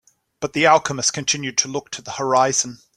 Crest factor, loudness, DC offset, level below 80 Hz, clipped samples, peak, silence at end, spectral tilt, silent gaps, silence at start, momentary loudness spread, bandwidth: 20 dB; -19 LUFS; under 0.1%; -60 dBFS; under 0.1%; -2 dBFS; 0.2 s; -2 dB/octave; none; 0.4 s; 12 LU; 14 kHz